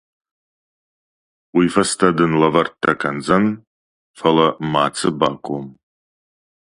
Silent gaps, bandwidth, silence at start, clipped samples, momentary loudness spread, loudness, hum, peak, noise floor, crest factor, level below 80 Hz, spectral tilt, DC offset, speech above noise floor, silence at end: 3.67-4.14 s; 11.5 kHz; 1.55 s; under 0.1%; 11 LU; -18 LUFS; none; 0 dBFS; under -90 dBFS; 20 dB; -54 dBFS; -5 dB/octave; under 0.1%; over 73 dB; 1.05 s